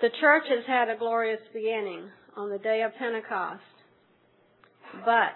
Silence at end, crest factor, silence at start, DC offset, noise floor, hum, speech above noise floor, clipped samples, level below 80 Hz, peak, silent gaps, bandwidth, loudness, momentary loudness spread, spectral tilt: 0 s; 20 dB; 0 s; under 0.1%; -64 dBFS; none; 37 dB; under 0.1%; under -90 dBFS; -8 dBFS; none; 4.2 kHz; -27 LUFS; 17 LU; -7 dB/octave